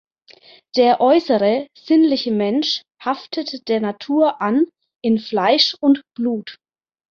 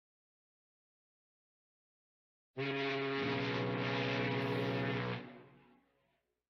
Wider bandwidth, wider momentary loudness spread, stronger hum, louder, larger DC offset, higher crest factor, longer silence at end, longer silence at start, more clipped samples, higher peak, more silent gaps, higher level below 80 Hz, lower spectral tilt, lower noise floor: about the same, 7 kHz vs 6.8 kHz; first, 10 LU vs 7 LU; neither; first, -18 LUFS vs -37 LUFS; neither; about the same, 18 dB vs 16 dB; second, 0.55 s vs 1 s; second, 0.75 s vs 2.55 s; neither; first, -2 dBFS vs -24 dBFS; neither; first, -66 dBFS vs -74 dBFS; second, -5.5 dB/octave vs -7 dB/octave; second, -48 dBFS vs -81 dBFS